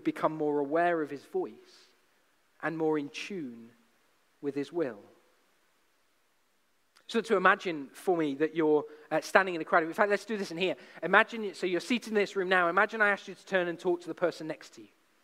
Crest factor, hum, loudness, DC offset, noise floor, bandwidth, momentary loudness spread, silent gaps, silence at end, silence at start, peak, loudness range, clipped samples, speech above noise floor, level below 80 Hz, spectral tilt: 28 dB; none; -30 LUFS; under 0.1%; -74 dBFS; 15.5 kHz; 13 LU; none; 0.4 s; 0.05 s; -4 dBFS; 11 LU; under 0.1%; 44 dB; -82 dBFS; -5 dB/octave